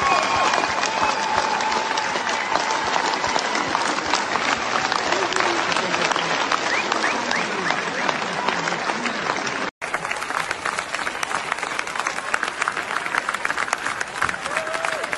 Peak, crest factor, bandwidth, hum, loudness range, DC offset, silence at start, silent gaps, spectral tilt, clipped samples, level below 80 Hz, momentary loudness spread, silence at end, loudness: -2 dBFS; 22 dB; 12 kHz; none; 4 LU; under 0.1%; 0 s; 9.71-9.81 s; -2 dB/octave; under 0.1%; -56 dBFS; 5 LU; 0 s; -22 LUFS